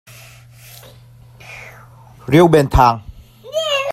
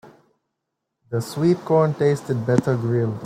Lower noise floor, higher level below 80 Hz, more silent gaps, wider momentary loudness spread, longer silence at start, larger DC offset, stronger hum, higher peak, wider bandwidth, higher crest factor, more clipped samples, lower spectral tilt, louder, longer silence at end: second, -43 dBFS vs -80 dBFS; first, -32 dBFS vs -60 dBFS; neither; first, 24 LU vs 9 LU; first, 1.5 s vs 0.05 s; neither; neither; first, 0 dBFS vs -4 dBFS; about the same, 15 kHz vs 15 kHz; about the same, 18 dB vs 18 dB; neither; second, -6 dB/octave vs -8 dB/octave; first, -14 LUFS vs -21 LUFS; about the same, 0 s vs 0 s